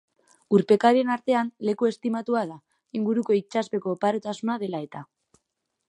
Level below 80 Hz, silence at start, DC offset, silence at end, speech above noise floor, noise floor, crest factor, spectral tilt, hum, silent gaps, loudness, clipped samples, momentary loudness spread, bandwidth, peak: -76 dBFS; 0.5 s; under 0.1%; 0.85 s; 56 dB; -80 dBFS; 20 dB; -6.5 dB/octave; none; none; -25 LUFS; under 0.1%; 13 LU; 11 kHz; -6 dBFS